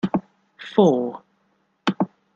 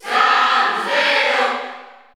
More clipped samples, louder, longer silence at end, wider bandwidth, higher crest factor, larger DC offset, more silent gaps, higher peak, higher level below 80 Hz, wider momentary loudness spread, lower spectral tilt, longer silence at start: neither; second, -22 LUFS vs -15 LUFS; about the same, 0.3 s vs 0.25 s; second, 7.6 kHz vs 17 kHz; about the same, 20 dB vs 16 dB; neither; neither; about the same, -4 dBFS vs -2 dBFS; about the same, -66 dBFS vs -70 dBFS; first, 18 LU vs 10 LU; first, -7.5 dB/octave vs -1 dB/octave; about the same, 0.05 s vs 0.05 s